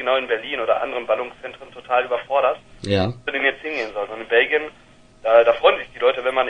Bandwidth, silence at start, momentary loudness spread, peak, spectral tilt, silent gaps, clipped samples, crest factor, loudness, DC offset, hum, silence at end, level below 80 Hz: 10.5 kHz; 0 s; 13 LU; -2 dBFS; -5.5 dB/octave; none; under 0.1%; 18 dB; -20 LUFS; under 0.1%; none; 0 s; -54 dBFS